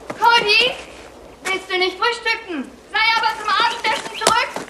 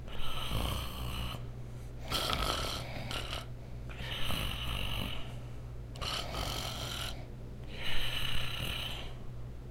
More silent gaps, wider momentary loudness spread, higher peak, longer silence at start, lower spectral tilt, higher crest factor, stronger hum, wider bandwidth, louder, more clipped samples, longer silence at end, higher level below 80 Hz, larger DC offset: neither; first, 15 LU vs 12 LU; first, 0 dBFS vs -14 dBFS; about the same, 0 s vs 0 s; second, -1 dB/octave vs -3.5 dB/octave; about the same, 20 dB vs 22 dB; neither; about the same, 15.5 kHz vs 16 kHz; first, -17 LUFS vs -38 LUFS; neither; about the same, 0 s vs 0 s; second, -54 dBFS vs -42 dBFS; neither